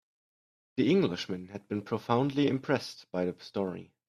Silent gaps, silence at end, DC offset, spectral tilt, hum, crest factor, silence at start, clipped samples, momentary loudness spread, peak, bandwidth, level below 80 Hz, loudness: none; 0.25 s; under 0.1%; -6.5 dB/octave; none; 20 dB; 0.75 s; under 0.1%; 11 LU; -12 dBFS; 13 kHz; -70 dBFS; -31 LUFS